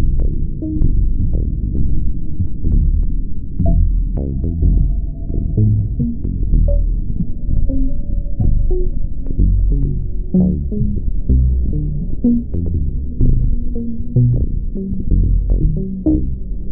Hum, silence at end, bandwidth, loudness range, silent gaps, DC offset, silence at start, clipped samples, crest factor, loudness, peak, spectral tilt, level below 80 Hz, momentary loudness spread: none; 0 s; 0.9 kHz; 2 LU; none; under 0.1%; 0 s; under 0.1%; 12 dB; -19 LUFS; -2 dBFS; -17.5 dB/octave; -16 dBFS; 8 LU